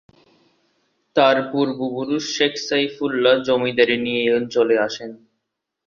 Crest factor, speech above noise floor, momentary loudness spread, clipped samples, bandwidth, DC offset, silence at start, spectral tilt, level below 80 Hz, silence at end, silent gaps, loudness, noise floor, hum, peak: 18 dB; 60 dB; 7 LU; under 0.1%; 7.2 kHz; under 0.1%; 1.15 s; -4 dB/octave; -64 dBFS; 0.7 s; none; -19 LUFS; -79 dBFS; none; -2 dBFS